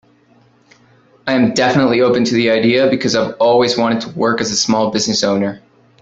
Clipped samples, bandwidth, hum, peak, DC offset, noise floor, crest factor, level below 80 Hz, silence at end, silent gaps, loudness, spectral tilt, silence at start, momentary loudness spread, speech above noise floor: under 0.1%; 8 kHz; none; -2 dBFS; under 0.1%; -51 dBFS; 14 dB; -54 dBFS; 0.45 s; none; -14 LUFS; -4 dB/octave; 1.25 s; 5 LU; 38 dB